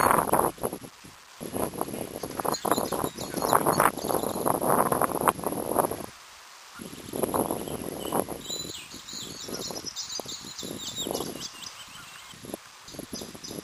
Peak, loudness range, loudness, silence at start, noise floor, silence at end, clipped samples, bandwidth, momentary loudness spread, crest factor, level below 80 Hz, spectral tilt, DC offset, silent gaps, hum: 0 dBFS; 9 LU; -29 LUFS; 0 s; -49 dBFS; 0 s; under 0.1%; 15.5 kHz; 18 LU; 30 dB; -56 dBFS; -3.5 dB/octave; under 0.1%; none; none